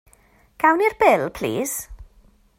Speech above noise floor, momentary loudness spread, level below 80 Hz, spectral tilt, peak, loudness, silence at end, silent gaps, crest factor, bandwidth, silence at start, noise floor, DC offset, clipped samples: 37 dB; 12 LU; -48 dBFS; -4 dB/octave; -2 dBFS; -20 LUFS; 0.55 s; none; 20 dB; 16 kHz; 0.6 s; -56 dBFS; under 0.1%; under 0.1%